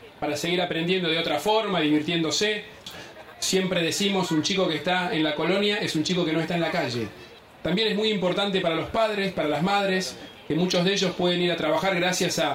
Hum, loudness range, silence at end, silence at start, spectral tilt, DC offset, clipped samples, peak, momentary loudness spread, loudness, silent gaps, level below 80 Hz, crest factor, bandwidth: none; 1 LU; 0 s; 0 s; -4 dB/octave; under 0.1%; under 0.1%; -10 dBFS; 7 LU; -24 LUFS; none; -60 dBFS; 14 dB; 16 kHz